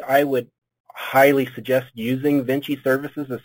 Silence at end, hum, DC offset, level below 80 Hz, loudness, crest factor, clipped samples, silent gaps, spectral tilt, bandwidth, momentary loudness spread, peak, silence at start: 0.05 s; none; under 0.1%; -66 dBFS; -20 LUFS; 18 dB; under 0.1%; 0.80-0.84 s; -6 dB/octave; 17 kHz; 10 LU; -2 dBFS; 0 s